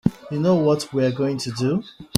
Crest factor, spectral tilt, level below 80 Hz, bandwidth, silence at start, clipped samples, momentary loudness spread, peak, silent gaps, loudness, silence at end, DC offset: 22 dB; -6 dB/octave; -54 dBFS; 15 kHz; 0.05 s; under 0.1%; 6 LU; 0 dBFS; none; -22 LUFS; 0 s; under 0.1%